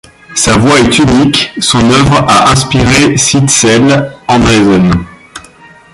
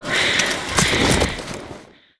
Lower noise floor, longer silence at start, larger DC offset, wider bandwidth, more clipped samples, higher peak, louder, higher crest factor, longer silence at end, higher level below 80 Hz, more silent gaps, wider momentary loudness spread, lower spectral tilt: second, -36 dBFS vs -41 dBFS; first, 0.3 s vs 0 s; neither; first, 16 kHz vs 11 kHz; first, 0.2% vs under 0.1%; about the same, 0 dBFS vs -2 dBFS; first, -7 LUFS vs -18 LUFS; second, 8 dB vs 20 dB; first, 0.55 s vs 0.35 s; first, -28 dBFS vs -36 dBFS; neither; second, 5 LU vs 16 LU; about the same, -4 dB/octave vs -3 dB/octave